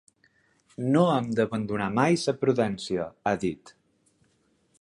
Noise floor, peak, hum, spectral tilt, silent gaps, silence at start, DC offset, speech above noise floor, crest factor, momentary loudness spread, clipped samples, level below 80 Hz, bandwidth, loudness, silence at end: -68 dBFS; -6 dBFS; none; -6 dB/octave; none; 0.8 s; under 0.1%; 42 dB; 22 dB; 10 LU; under 0.1%; -62 dBFS; 11.5 kHz; -26 LUFS; 1.1 s